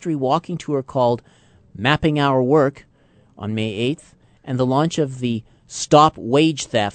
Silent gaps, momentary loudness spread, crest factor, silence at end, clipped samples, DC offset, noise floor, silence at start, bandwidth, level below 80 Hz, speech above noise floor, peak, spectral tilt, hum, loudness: none; 12 LU; 20 dB; 0 s; under 0.1%; under 0.1%; -54 dBFS; 0 s; 9.2 kHz; -50 dBFS; 35 dB; 0 dBFS; -5.5 dB/octave; none; -19 LUFS